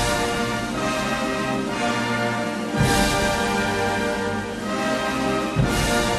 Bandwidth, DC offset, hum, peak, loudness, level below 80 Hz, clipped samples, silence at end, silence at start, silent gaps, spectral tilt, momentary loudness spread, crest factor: 13 kHz; under 0.1%; none; -8 dBFS; -22 LUFS; -36 dBFS; under 0.1%; 0 s; 0 s; none; -4.5 dB/octave; 5 LU; 16 dB